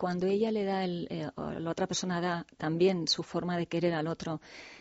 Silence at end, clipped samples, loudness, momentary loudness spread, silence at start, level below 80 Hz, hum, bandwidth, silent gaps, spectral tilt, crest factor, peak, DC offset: 0 s; under 0.1%; -32 LUFS; 10 LU; 0 s; -64 dBFS; none; 8 kHz; none; -4.5 dB/octave; 16 dB; -16 dBFS; under 0.1%